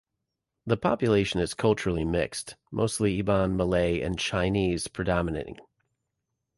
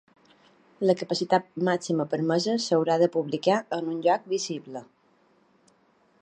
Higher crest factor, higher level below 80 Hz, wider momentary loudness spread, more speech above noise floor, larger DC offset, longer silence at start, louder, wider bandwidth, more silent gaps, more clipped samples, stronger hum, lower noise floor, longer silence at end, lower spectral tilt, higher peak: about the same, 18 dB vs 20 dB; first, -44 dBFS vs -78 dBFS; about the same, 8 LU vs 7 LU; first, 57 dB vs 39 dB; neither; second, 0.65 s vs 0.8 s; about the same, -27 LUFS vs -26 LUFS; first, 11.5 kHz vs 9.8 kHz; neither; neither; neither; first, -84 dBFS vs -64 dBFS; second, 0.95 s vs 1.4 s; about the same, -5.5 dB/octave vs -5 dB/octave; about the same, -10 dBFS vs -8 dBFS